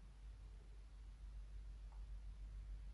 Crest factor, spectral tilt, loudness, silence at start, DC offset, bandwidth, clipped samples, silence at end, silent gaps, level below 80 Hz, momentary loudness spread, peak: 10 dB; -6 dB/octave; -58 LUFS; 0 s; under 0.1%; 11 kHz; under 0.1%; 0 s; none; -54 dBFS; 5 LU; -44 dBFS